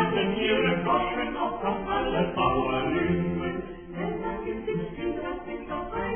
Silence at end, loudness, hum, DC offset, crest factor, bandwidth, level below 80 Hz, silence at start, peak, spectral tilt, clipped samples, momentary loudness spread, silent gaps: 0 s; -28 LUFS; none; 0.1%; 16 dB; 3.5 kHz; -46 dBFS; 0 s; -10 dBFS; -10 dB/octave; under 0.1%; 10 LU; none